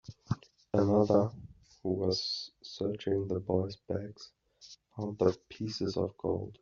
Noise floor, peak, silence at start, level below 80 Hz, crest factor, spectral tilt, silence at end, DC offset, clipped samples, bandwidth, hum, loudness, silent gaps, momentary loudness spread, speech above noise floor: -57 dBFS; -12 dBFS; 0.1 s; -66 dBFS; 20 dB; -6.5 dB/octave; 0.1 s; under 0.1%; under 0.1%; 7.4 kHz; none; -33 LUFS; none; 19 LU; 26 dB